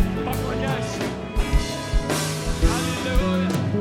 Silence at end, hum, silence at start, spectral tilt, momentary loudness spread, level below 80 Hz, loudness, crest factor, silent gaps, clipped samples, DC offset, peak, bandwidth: 0 s; none; 0 s; -5 dB/octave; 4 LU; -26 dBFS; -24 LUFS; 16 dB; none; under 0.1%; under 0.1%; -6 dBFS; 17 kHz